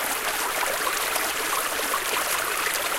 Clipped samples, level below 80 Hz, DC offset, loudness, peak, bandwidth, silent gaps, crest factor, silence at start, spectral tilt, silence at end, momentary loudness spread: under 0.1%; -54 dBFS; under 0.1%; -24 LUFS; -6 dBFS; 17 kHz; none; 20 dB; 0 s; 0.5 dB/octave; 0 s; 1 LU